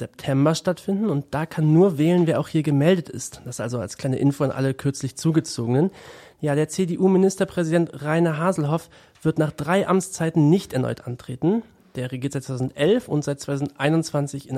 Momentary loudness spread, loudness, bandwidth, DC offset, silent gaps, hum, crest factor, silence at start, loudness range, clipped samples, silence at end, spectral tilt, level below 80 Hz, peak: 10 LU; -22 LUFS; 15 kHz; under 0.1%; none; none; 16 dB; 0 s; 3 LU; under 0.1%; 0 s; -6.5 dB/octave; -58 dBFS; -6 dBFS